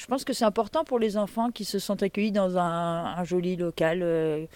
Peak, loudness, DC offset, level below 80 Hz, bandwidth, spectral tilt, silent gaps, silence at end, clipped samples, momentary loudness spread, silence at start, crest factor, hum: -12 dBFS; -27 LUFS; under 0.1%; -58 dBFS; 17 kHz; -5.5 dB/octave; none; 0.1 s; under 0.1%; 4 LU; 0 s; 16 dB; none